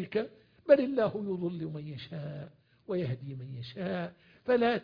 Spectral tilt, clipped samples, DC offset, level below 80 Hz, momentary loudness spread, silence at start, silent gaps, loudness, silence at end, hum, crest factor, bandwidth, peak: -5.5 dB/octave; under 0.1%; under 0.1%; -70 dBFS; 17 LU; 0 s; none; -32 LUFS; 0 s; none; 22 dB; 5.2 kHz; -10 dBFS